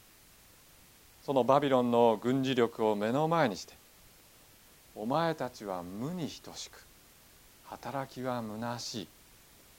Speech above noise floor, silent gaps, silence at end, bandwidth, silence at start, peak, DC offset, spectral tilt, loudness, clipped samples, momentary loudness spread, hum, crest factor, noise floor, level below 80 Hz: 28 dB; none; 0.7 s; 17 kHz; 1.3 s; -12 dBFS; under 0.1%; -5.5 dB/octave; -31 LUFS; under 0.1%; 18 LU; none; 22 dB; -59 dBFS; -68 dBFS